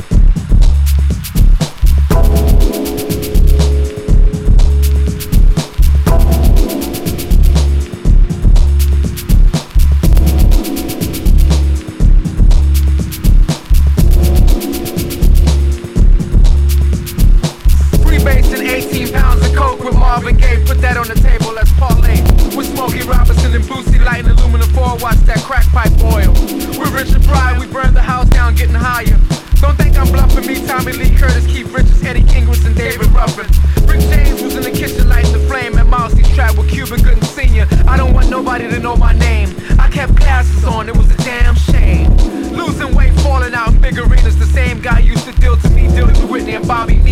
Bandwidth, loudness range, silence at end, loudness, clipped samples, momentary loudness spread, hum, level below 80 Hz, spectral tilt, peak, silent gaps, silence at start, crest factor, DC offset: 16 kHz; 1 LU; 0 s; -13 LUFS; 0.3%; 5 LU; none; -10 dBFS; -6 dB/octave; 0 dBFS; none; 0 s; 8 dB; under 0.1%